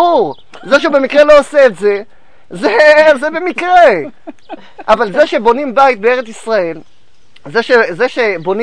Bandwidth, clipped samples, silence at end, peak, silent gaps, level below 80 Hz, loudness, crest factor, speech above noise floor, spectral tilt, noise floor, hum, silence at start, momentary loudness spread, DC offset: 10 kHz; 0.9%; 0 s; 0 dBFS; none; -44 dBFS; -10 LUFS; 12 dB; 39 dB; -4.5 dB/octave; -49 dBFS; none; 0 s; 12 LU; 2%